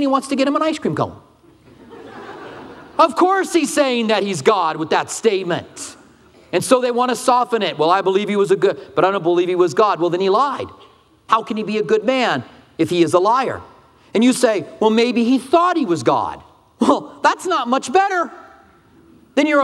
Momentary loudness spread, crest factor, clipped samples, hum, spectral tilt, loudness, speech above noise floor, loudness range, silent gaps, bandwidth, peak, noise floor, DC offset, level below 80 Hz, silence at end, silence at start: 12 LU; 18 dB; under 0.1%; none; -4.5 dB/octave; -17 LUFS; 33 dB; 3 LU; none; 13.5 kHz; 0 dBFS; -49 dBFS; under 0.1%; -62 dBFS; 0 s; 0 s